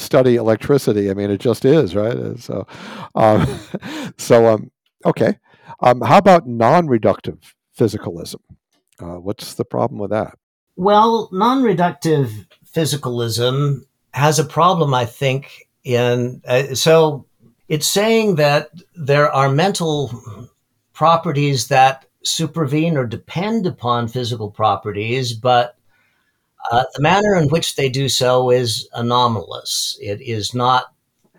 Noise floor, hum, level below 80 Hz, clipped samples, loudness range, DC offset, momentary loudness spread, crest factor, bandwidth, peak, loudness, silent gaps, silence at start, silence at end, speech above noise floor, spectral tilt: -65 dBFS; none; -52 dBFS; under 0.1%; 4 LU; under 0.1%; 14 LU; 16 dB; 19 kHz; -2 dBFS; -17 LUFS; 10.43-10.67 s; 0 s; 0.5 s; 49 dB; -5 dB/octave